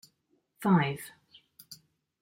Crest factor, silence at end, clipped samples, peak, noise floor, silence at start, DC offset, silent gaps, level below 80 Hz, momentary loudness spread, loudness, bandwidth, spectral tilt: 20 dB; 0.45 s; under 0.1%; -12 dBFS; -74 dBFS; 0.6 s; under 0.1%; none; -72 dBFS; 24 LU; -29 LUFS; 16.5 kHz; -6.5 dB/octave